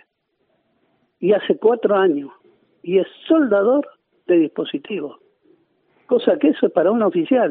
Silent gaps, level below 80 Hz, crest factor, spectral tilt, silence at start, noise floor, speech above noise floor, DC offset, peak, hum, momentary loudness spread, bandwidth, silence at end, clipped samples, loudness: none; -72 dBFS; 18 dB; -5 dB/octave; 1.2 s; -69 dBFS; 52 dB; under 0.1%; -2 dBFS; none; 12 LU; 4 kHz; 0 s; under 0.1%; -18 LUFS